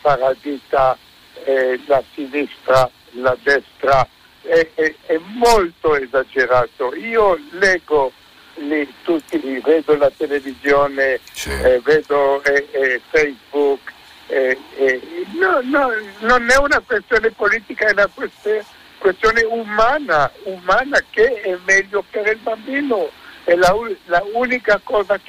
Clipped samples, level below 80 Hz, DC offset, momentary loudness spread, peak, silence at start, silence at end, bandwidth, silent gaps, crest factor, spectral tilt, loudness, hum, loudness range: under 0.1%; -42 dBFS; under 0.1%; 8 LU; 0 dBFS; 0.05 s; 0.1 s; 16 kHz; none; 16 dB; -4 dB/octave; -17 LUFS; none; 2 LU